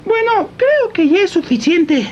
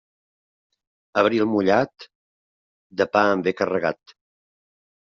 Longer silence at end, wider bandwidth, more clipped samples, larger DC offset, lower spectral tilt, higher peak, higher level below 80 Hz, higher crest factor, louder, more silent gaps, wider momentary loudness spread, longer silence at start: second, 0 s vs 1.25 s; first, 8.6 kHz vs 7.2 kHz; neither; neither; about the same, -5 dB/octave vs -4 dB/octave; about the same, -2 dBFS vs -4 dBFS; first, -52 dBFS vs -66 dBFS; second, 10 dB vs 22 dB; first, -14 LUFS vs -21 LUFS; second, none vs 2.15-2.90 s; second, 3 LU vs 10 LU; second, 0.05 s vs 1.15 s